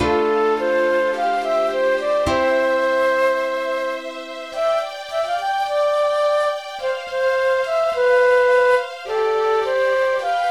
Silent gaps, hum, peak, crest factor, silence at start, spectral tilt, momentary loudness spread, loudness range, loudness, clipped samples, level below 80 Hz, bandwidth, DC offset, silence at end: none; none; -6 dBFS; 12 dB; 0 s; -4 dB/octave; 9 LU; 4 LU; -19 LUFS; under 0.1%; -50 dBFS; 12.5 kHz; 0.1%; 0 s